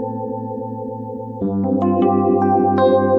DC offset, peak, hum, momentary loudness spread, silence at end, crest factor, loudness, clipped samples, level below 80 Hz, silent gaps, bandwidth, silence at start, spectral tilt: under 0.1%; -4 dBFS; none; 13 LU; 0 s; 14 dB; -18 LUFS; under 0.1%; -56 dBFS; none; 5.2 kHz; 0 s; -10.5 dB/octave